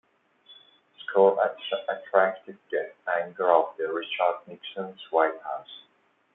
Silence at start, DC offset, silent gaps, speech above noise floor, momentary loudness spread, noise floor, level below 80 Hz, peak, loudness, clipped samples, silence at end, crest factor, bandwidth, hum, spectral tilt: 0.5 s; under 0.1%; none; 31 dB; 16 LU; -58 dBFS; -84 dBFS; -6 dBFS; -26 LUFS; under 0.1%; 0.55 s; 22 dB; 4 kHz; none; -7.5 dB/octave